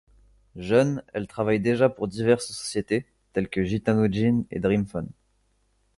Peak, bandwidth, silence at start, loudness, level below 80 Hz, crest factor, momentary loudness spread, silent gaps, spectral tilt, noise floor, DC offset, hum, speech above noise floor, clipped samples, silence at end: -6 dBFS; 11.5 kHz; 0.55 s; -25 LUFS; -52 dBFS; 20 dB; 10 LU; none; -6.5 dB/octave; -68 dBFS; under 0.1%; none; 44 dB; under 0.1%; 0.85 s